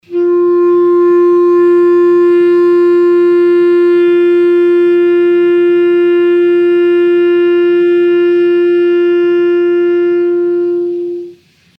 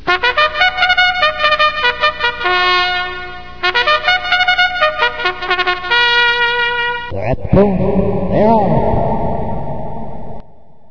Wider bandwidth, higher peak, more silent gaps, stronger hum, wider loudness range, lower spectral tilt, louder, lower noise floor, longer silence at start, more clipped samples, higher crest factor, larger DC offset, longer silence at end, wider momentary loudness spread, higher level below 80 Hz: second, 4.4 kHz vs 5.4 kHz; second, -4 dBFS vs 0 dBFS; neither; second, none vs 60 Hz at -45 dBFS; about the same, 2 LU vs 3 LU; first, -7 dB/octave vs -5.5 dB/octave; first, -9 LUFS vs -13 LUFS; second, -38 dBFS vs -42 dBFS; about the same, 0.1 s vs 0 s; second, under 0.1% vs 0.2%; second, 6 dB vs 14 dB; second, under 0.1% vs 2%; first, 0.5 s vs 0 s; second, 4 LU vs 12 LU; second, -68 dBFS vs -32 dBFS